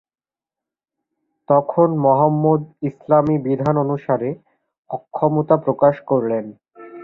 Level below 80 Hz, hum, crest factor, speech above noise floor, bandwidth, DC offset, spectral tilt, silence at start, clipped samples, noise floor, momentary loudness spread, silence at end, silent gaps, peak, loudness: -58 dBFS; none; 18 dB; over 73 dB; 4.1 kHz; under 0.1%; -11.5 dB/octave; 1.5 s; under 0.1%; under -90 dBFS; 13 LU; 0 s; 4.78-4.83 s; -2 dBFS; -18 LUFS